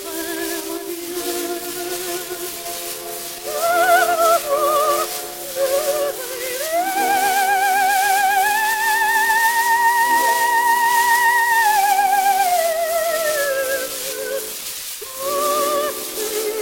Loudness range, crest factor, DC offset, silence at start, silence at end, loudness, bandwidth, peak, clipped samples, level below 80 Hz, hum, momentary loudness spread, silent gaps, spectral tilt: 6 LU; 16 dB; under 0.1%; 0 s; 0 s; -18 LUFS; 17 kHz; -2 dBFS; under 0.1%; -58 dBFS; none; 11 LU; none; 0 dB/octave